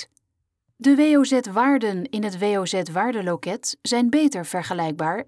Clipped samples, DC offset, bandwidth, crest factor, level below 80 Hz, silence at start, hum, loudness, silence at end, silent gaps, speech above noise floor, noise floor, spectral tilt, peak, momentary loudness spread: under 0.1%; under 0.1%; 11 kHz; 14 dB; -72 dBFS; 0 s; none; -21 LUFS; 0.05 s; none; 55 dB; -76 dBFS; -4.5 dB/octave; -8 dBFS; 10 LU